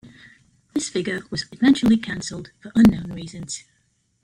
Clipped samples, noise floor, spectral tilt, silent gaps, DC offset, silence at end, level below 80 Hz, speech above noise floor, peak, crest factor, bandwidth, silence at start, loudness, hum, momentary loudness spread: under 0.1%; -54 dBFS; -5 dB/octave; none; under 0.1%; 0.65 s; -48 dBFS; 33 dB; -2 dBFS; 22 dB; 14.5 kHz; 0.05 s; -21 LUFS; none; 17 LU